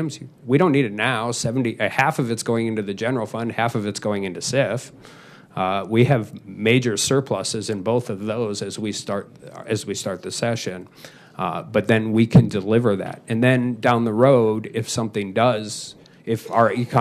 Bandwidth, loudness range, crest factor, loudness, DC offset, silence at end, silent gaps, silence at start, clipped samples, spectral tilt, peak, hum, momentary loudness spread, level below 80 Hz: 14.5 kHz; 7 LU; 18 dB; -21 LUFS; under 0.1%; 0 s; none; 0 s; under 0.1%; -5.5 dB/octave; -4 dBFS; none; 12 LU; -56 dBFS